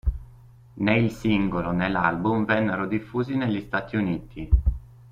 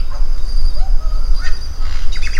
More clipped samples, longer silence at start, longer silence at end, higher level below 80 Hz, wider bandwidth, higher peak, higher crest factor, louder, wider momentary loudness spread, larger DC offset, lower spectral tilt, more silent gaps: neither; about the same, 0.05 s vs 0 s; first, 0.25 s vs 0 s; second, -32 dBFS vs -14 dBFS; first, 7.6 kHz vs 6.6 kHz; second, -6 dBFS vs 0 dBFS; first, 18 dB vs 10 dB; about the same, -25 LUFS vs -24 LUFS; first, 7 LU vs 4 LU; neither; first, -8 dB/octave vs -4 dB/octave; neither